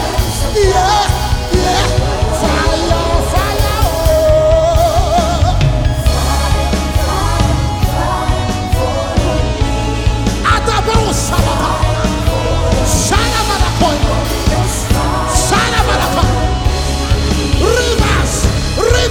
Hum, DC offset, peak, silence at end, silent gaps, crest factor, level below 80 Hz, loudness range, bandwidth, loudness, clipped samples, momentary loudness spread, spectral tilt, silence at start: none; under 0.1%; 0 dBFS; 0 s; none; 12 dB; -18 dBFS; 2 LU; 19 kHz; -13 LUFS; under 0.1%; 4 LU; -4.5 dB/octave; 0 s